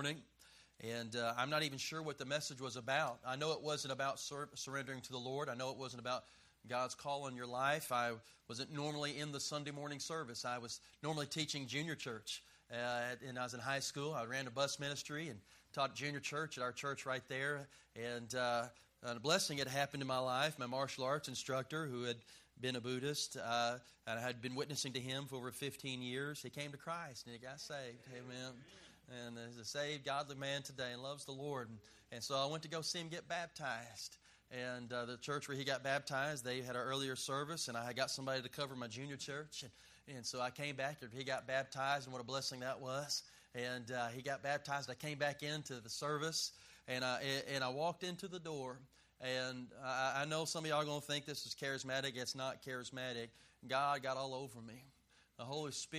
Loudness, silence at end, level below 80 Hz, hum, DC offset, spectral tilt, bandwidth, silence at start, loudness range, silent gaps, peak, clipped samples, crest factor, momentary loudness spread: -42 LUFS; 0 s; -78 dBFS; none; under 0.1%; -3.5 dB/octave; 15 kHz; 0 s; 4 LU; none; -20 dBFS; under 0.1%; 24 dB; 10 LU